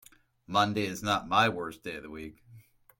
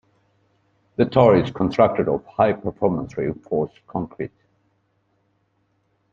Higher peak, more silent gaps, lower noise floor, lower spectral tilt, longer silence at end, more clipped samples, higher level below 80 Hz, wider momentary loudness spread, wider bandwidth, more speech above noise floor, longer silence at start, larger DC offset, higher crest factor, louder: second, -10 dBFS vs -2 dBFS; neither; second, -56 dBFS vs -67 dBFS; second, -4.5 dB/octave vs -8.5 dB/octave; second, 0.4 s vs 1.85 s; neither; second, -64 dBFS vs -52 dBFS; first, 18 LU vs 15 LU; first, 16.5 kHz vs 7.2 kHz; second, 26 dB vs 47 dB; second, 0.5 s vs 1 s; neither; about the same, 22 dB vs 20 dB; second, -29 LUFS vs -21 LUFS